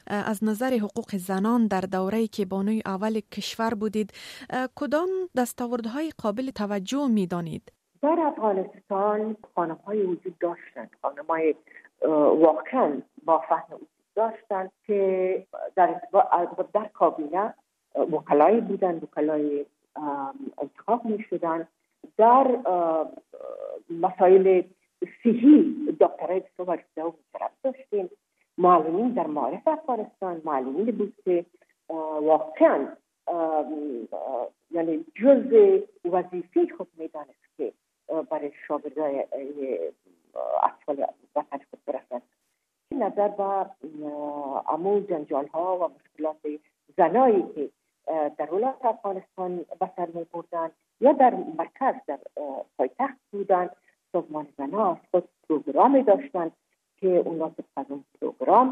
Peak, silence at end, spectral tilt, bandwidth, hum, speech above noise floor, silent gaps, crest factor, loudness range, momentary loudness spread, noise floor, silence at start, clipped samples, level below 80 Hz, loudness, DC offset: -6 dBFS; 0 s; -7 dB/octave; 14 kHz; none; 52 dB; none; 20 dB; 7 LU; 15 LU; -77 dBFS; 0.1 s; under 0.1%; -74 dBFS; -25 LUFS; under 0.1%